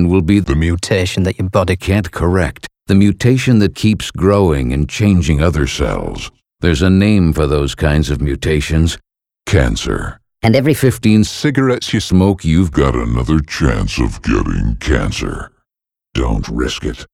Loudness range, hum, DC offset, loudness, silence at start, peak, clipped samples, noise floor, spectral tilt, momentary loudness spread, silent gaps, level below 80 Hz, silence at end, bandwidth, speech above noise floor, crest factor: 3 LU; none; under 0.1%; -14 LUFS; 0 s; 0 dBFS; under 0.1%; -85 dBFS; -6 dB/octave; 9 LU; none; -24 dBFS; 0.1 s; 15.5 kHz; 71 dB; 14 dB